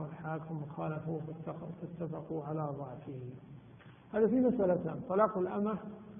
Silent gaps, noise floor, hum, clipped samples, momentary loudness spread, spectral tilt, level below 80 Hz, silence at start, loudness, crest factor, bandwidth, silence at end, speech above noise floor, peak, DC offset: none; -56 dBFS; none; under 0.1%; 16 LU; -12 dB/octave; -68 dBFS; 0 s; -35 LUFS; 20 dB; 3.7 kHz; 0 s; 21 dB; -16 dBFS; under 0.1%